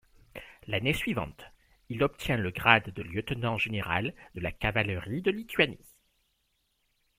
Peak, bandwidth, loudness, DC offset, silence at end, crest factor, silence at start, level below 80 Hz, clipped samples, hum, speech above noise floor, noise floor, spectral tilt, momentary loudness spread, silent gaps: -2 dBFS; 16 kHz; -29 LUFS; under 0.1%; 1.45 s; 28 dB; 0.35 s; -52 dBFS; under 0.1%; none; 45 dB; -75 dBFS; -5.5 dB/octave; 17 LU; none